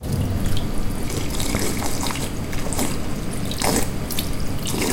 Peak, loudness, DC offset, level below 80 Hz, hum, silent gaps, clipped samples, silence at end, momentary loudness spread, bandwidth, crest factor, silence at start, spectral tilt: -4 dBFS; -25 LUFS; 2%; -28 dBFS; none; none; under 0.1%; 0 s; 6 LU; 17 kHz; 18 dB; 0 s; -4 dB/octave